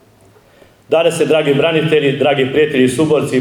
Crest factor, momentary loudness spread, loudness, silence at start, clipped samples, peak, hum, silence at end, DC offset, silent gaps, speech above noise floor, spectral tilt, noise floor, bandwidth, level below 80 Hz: 14 dB; 2 LU; -13 LUFS; 0.9 s; under 0.1%; 0 dBFS; none; 0 s; under 0.1%; none; 35 dB; -5.5 dB/octave; -47 dBFS; 14.5 kHz; -56 dBFS